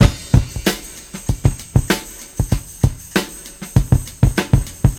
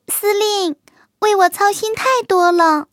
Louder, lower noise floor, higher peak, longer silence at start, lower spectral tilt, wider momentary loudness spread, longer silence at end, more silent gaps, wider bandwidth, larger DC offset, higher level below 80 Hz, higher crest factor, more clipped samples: second, -19 LUFS vs -15 LUFS; second, -34 dBFS vs -40 dBFS; about the same, 0 dBFS vs -2 dBFS; about the same, 0 s vs 0.1 s; first, -5.5 dB/octave vs -1.5 dB/octave; first, 12 LU vs 7 LU; about the same, 0 s vs 0.1 s; neither; about the same, 18 kHz vs 17 kHz; neither; first, -24 dBFS vs -64 dBFS; about the same, 18 dB vs 14 dB; neither